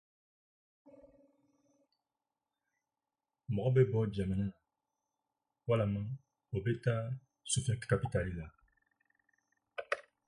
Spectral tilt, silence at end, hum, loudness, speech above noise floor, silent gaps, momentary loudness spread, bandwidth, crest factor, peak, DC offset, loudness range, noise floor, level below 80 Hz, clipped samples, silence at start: -6 dB/octave; 0.25 s; none; -35 LUFS; over 57 dB; none; 16 LU; 11.5 kHz; 22 dB; -16 dBFS; under 0.1%; 3 LU; under -90 dBFS; -58 dBFS; under 0.1%; 0.85 s